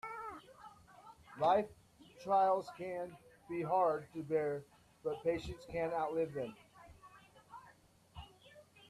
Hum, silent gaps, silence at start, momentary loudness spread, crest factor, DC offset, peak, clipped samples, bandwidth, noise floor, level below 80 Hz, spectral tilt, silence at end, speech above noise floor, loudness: none; none; 0.05 s; 25 LU; 20 dB; under 0.1%; -20 dBFS; under 0.1%; 13.5 kHz; -65 dBFS; -66 dBFS; -6.5 dB/octave; 0.25 s; 30 dB; -37 LUFS